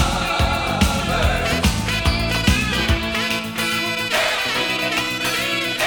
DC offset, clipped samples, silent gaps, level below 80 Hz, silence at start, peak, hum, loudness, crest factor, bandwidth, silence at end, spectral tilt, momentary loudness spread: under 0.1%; under 0.1%; none; -28 dBFS; 0 s; -2 dBFS; none; -19 LUFS; 18 dB; over 20 kHz; 0 s; -3.5 dB/octave; 2 LU